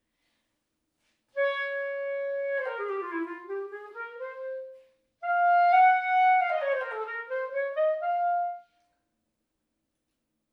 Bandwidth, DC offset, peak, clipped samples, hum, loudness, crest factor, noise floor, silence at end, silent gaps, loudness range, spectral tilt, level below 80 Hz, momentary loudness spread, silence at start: 5.4 kHz; under 0.1%; -12 dBFS; under 0.1%; none; -27 LUFS; 18 dB; -81 dBFS; 1.9 s; none; 9 LU; -2.5 dB/octave; under -90 dBFS; 17 LU; 1.35 s